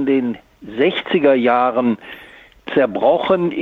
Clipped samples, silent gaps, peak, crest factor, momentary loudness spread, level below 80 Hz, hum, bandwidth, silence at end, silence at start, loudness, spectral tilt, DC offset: under 0.1%; none; -2 dBFS; 14 dB; 18 LU; -56 dBFS; none; 5.2 kHz; 0 s; 0 s; -17 LUFS; -8 dB/octave; under 0.1%